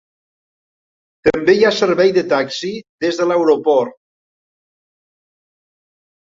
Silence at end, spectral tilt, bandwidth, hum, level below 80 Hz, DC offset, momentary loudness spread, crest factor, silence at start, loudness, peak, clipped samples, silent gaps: 2.5 s; -5 dB/octave; 7.8 kHz; none; -54 dBFS; under 0.1%; 10 LU; 18 dB; 1.25 s; -15 LUFS; -2 dBFS; under 0.1%; 2.89-2.98 s